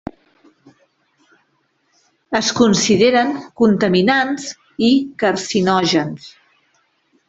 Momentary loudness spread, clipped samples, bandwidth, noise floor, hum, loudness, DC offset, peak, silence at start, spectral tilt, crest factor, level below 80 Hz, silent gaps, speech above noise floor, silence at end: 12 LU; under 0.1%; 8.2 kHz; -64 dBFS; none; -16 LUFS; under 0.1%; -2 dBFS; 2.3 s; -4.5 dB/octave; 16 dB; -56 dBFS; none; 49 dB; 1 s